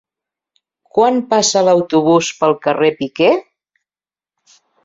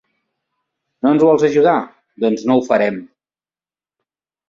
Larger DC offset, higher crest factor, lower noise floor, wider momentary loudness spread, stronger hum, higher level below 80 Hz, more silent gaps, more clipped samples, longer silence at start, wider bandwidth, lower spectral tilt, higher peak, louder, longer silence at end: neither; about the same, 14 dB vs 16 dB; about the same, under -90 dBFS vs under -90 dBFS; second, 4 LU vs 9 LU; neither; about the same, -60 dBFS vs -62 dBFS; neither; neither; about the same, 0.95 s vs 1.05 s; about the same, 7.8 kHz vs 7.6 kHz; second, -4 dB/octave vs -6.5 dB/octave; about the same, -2 dBFS vs -2 dBFS; about the same, -14 LUFS vs -15 LUFS; about the same, 1.45 s vs 1.45 s